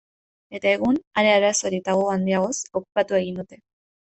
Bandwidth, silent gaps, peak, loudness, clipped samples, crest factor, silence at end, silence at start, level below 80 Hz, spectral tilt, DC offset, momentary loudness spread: 8.4 kHz; 1.07-1.11 s; -4 dBFS; -22 LUFS; under 0.1%; 18 dB; 0.5 s; 0.5 s; -60 dBFS; -4 dB/octave; under 0.1%; 12 LU